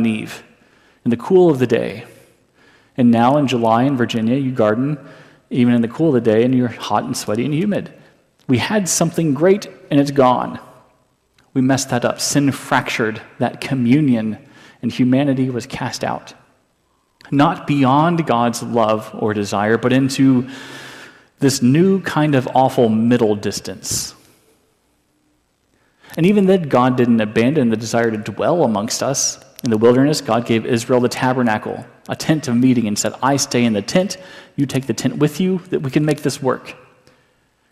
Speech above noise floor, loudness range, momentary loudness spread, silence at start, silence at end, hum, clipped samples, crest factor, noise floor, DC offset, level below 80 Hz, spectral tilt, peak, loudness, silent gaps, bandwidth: 46 dB; 3 LU; 11 LU; 0 s; 1 s; none; under 0.1%; 14 dB; -62 dBFS; under 0.1%; -56 dBFS; -5.5 dB/octave; -2 dBFS; -17 LUFS; none; 15 kHz